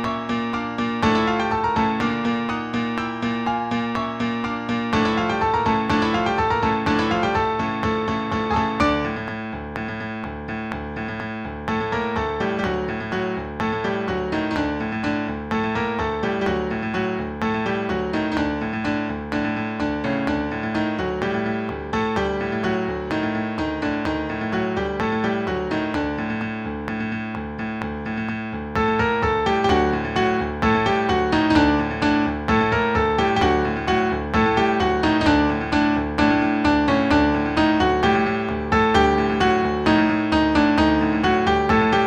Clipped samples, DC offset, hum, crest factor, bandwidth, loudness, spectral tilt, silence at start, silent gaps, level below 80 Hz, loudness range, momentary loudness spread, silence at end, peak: under 0.1%; under 0.1%; none; 18 dB; 9 kHz; -22 LUFS; -6.5 dB/octave; 0 s; none; -38 dBFS; 6 LU; 8 LU; 0 s; -4 dBFS